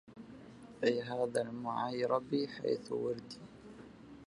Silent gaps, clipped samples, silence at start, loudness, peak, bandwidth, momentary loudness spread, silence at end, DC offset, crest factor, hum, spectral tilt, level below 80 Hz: none; under 0.1%; 0.05 s; -36 LUFS; -16 dBFS; 11 kHz; 20 LU; 0 s; under 0.1%; 22 dB; none; -5.5 dB/octave; -72 dBFS